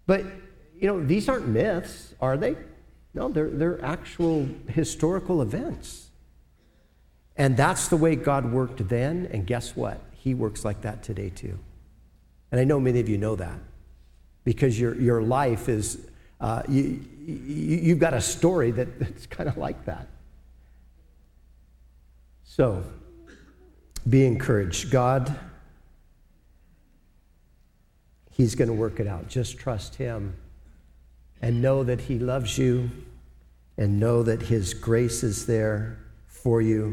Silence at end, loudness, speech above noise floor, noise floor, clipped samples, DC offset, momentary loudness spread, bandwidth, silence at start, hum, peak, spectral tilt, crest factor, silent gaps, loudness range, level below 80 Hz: 0 s; -26 LUFS; 36 dB; -60 dBFS; under 0.1%; under 0.1%; 14 LU; 14.5 kHz; 0.05 s; none; -8 dBFS; -6.5 dB/octave; 20 dB; none; 7 LU; -44 dBFS